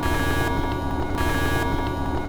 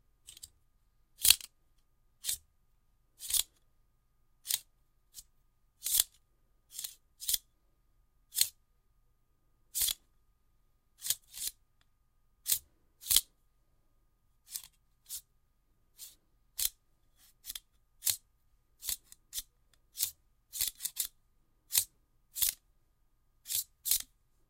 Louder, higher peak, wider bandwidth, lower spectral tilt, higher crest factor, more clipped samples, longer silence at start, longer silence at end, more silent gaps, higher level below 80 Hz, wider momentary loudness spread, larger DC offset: first, -24 LUFS vs -33 LUFS; second, -10 dBFS vs -2 dBFS; first, over 20 kHz vs 17 kHz; first, -5.5 dB/octave vs 3 dB/octave; second, 12 dB vs 36 dB; neither; second, 0 s vs 0.3 s; second, 0 s vs 0.45 s; neither; first, -30 dBFS vs -64 dBFS; second, 3 LU vs 23 LU; neither